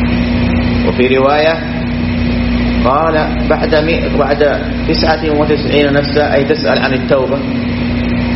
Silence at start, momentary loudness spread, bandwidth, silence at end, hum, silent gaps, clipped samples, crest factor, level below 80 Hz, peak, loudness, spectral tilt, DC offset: 0 s; 5 LU; 6 kHz; 0 s; 60 Hz at -20 dBFS; none; under 0.1%; 12 dB; -24 dBFS; 0 dBFS; -12 LUFS; -5 dB/octave; under 0.1%